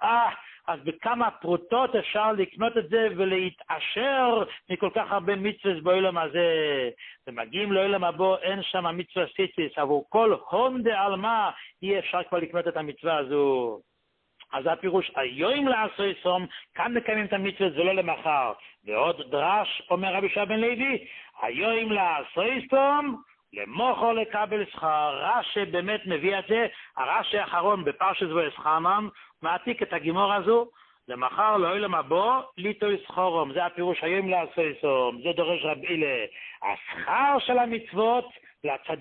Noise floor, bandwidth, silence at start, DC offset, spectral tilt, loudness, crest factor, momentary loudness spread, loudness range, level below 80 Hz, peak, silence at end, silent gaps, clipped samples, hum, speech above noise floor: -74 dBFS; 4.4 kHz; 0 s; under 0.1%; -9 dB/octave; -26 LUFS; 16 dB; 8 LU; 2 LU; -68 dBFS; -10 dBFS; 0 s; none; under 0.1%; none; 48 dB